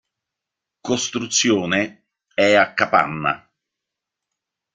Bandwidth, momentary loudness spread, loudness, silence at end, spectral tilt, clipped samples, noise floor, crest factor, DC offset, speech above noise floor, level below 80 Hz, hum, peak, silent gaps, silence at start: 10 kHz; 13 LU; -19 LUFS; 1.4 s; -3 dB/octave; under 0.1%; -84 dBFS; 22 dB; under 0.1%; 66 dB; -62 dBFS; none; 0 dBFS; none; 0.85 s